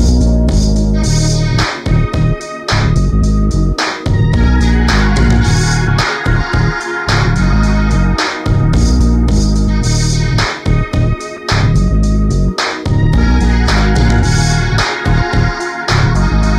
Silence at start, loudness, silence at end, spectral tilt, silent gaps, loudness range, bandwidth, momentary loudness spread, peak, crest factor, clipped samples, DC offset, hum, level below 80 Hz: 0 s; -13 LUFS; 0 s; -5.5 dB/octave; none; 1 LU; 11.5 kHz; 4 LU; 0 dBFS; 10 dB; under 0.1%; under 0.1%; none; -14 dBFS